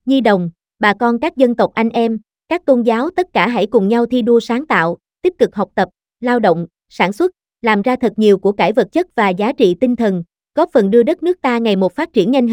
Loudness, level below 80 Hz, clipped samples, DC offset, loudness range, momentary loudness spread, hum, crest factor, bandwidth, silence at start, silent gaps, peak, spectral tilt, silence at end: -15 LUFS; -54 dBFS; under 0.1%; under 0.1%; 2 LU; 7 LU; none; 14 dB; 11 kHz; 0.05 s; none; 0 dBFS; -7 dB/octave; 0 s